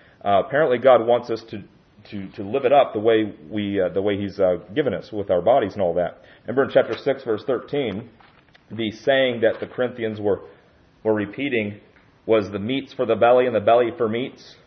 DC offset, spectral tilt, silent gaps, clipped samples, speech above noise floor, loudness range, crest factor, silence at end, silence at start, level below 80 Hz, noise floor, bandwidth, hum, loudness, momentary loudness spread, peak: under 0.1%; -7.5 dB/octave; none; under 0.1%; 33 dB; 4 LU; 18 dB; 0.15 s; 0.25 s; -62 dBFS; -54 dBFS; 6.4 kHz; none; -21 LUFS; 12 LU; -4 dBFS